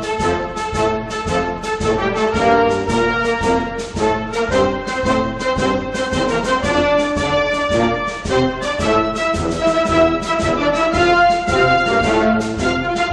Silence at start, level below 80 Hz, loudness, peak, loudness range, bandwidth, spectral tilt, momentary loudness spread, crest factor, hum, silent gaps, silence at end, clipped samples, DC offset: 0 s; -34 dBFS; -17 LUFS; -2 dBFS; 3 LU; 11.5 kHz; -5 dB/octave; 6 LU; 14 dB; none; none; 0 s; under 0.1%; under 0.1%